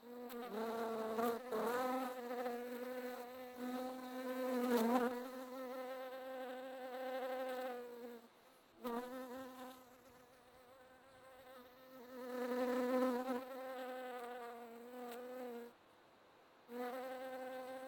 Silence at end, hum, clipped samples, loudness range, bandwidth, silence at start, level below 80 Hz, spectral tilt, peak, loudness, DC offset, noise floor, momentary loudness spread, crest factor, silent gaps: 0 s; none; under 0.1%; 10 LU; 19.5 kHz; 0 s; -84 dBFS; -4.5 dB/octave; -22 dBFS; -44 LUFS; under 0.1%; -67 dBFS; 21 LU; 24 dB; none